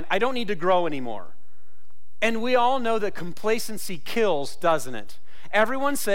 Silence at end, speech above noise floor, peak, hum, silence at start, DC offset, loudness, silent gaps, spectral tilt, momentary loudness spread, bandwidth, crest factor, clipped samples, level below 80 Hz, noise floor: 0 s; 40 dB; -10 dBFS; none; 0 s; 6%; -25 LUFS; none; -4 dB/octave; 11 LU; 16.5 kHz; 14 dB; under 0.1%; -60 dBFS; -64 dBFS